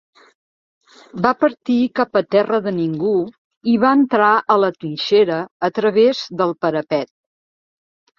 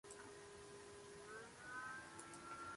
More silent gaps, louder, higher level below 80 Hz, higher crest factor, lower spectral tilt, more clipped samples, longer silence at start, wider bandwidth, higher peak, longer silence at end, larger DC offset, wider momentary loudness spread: first, 3.38-3.51 s, 3.57-3.61 s, 5.51-5.60 s vs none; first, -17 LUFS vs -55 LUFS; first, -62 dBFS vs -78 dBFS; about the same, 18 dB vs 16 dB; first, -6.5 dB/octave vs -3 dB/octave; neither; first, 1.15 s vs 0.05 s; second, 7 kHz vs 11.5 kHz; first, 0 dBFS vs -40 dBFS; first, 1.15 s vs 0 s; neither; about the same, 9 LU vs 7 LU